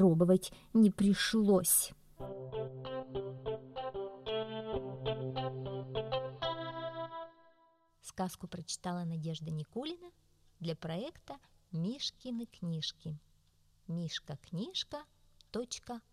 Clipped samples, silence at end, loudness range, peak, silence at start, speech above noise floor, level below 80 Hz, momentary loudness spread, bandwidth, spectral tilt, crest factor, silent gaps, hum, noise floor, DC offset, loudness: under 0.1%; 0.1 s; 10 LU; -16 dBFS; 0 s; 35 dB; -62 dBFS; 17 LU; 15.5 kHz; -5 dB/octave; 20 dB; none; none; -70 dBFS; under 0.1%; -36 LUFS